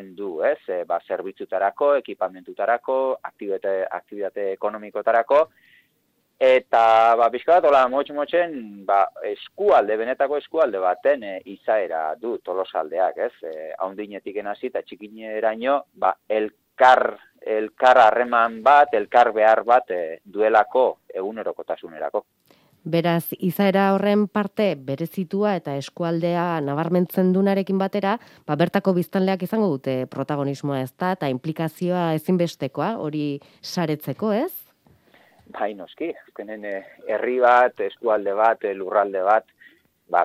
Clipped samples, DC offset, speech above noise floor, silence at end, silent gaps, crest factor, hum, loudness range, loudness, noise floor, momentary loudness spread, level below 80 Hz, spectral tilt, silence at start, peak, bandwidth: under 0.1%; under 0.1%; 47 dB; 0 s; none; 18 dB; none; 9 LU; -22 LUFS; -68 dBFS; 14 LU; -68 dBFS; -7 dB/octave; 0 s; -2 dBFS; 16 kHz